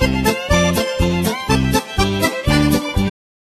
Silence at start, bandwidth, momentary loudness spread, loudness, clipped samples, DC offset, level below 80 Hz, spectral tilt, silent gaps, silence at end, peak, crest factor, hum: 0 s; 14 kHz; 4 LU; -17 LUFS; under 0.1%; under 0.1%; -26 dBFS; -5 dB/octave; none; 0.35 s; 0 dBFS; 16 dB; none